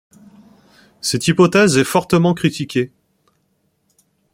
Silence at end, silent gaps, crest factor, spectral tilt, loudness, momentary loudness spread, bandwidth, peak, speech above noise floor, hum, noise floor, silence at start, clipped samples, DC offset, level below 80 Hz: 1.45 s; none; 18 dB; -5 dB/octave; -16 LUFS; 10 LU; 16.5 kHz; -2 dBFS; 50 dB; none; -65 dBFS; 1.05 s; under 0.1%; under 0.1%; -54 dBFS